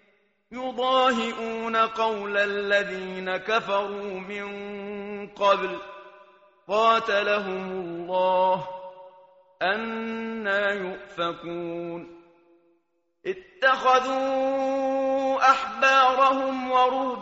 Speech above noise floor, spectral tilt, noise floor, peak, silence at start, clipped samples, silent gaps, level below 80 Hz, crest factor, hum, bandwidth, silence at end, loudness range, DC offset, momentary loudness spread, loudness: 48 dB; -1 dB/octave; -72 dBFS; -6 dBFS; 0.5 s; under 0.1%; none; -66 dBFS; 20 dB; none; 8 kHz; 0 s; 8 LU; under 0.1%; 14 LU; -24 LUFS